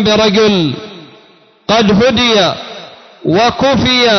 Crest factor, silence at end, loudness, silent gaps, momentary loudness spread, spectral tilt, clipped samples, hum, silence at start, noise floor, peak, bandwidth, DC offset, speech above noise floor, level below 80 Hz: 10 dB; 0 s; -10 LUFS; none; 18 LU; -4.5 dB/octave; under 0.1%; none; 0 s; -45 dBFS; -2 dBFS; 6.4 kHz; under 0.1%; 35 dB; -38 dBFS